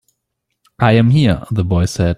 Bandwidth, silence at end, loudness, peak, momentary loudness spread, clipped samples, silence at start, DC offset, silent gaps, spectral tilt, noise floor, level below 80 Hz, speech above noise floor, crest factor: 12 kHz; 0 s; -14 LUFS; -2 dBFS; 6 LU; under 0.1%; 0.8 s; under 0.1%; none; -7 dB/octave; -74 dBFS; -36 dBFS; 61 dB; 14 dB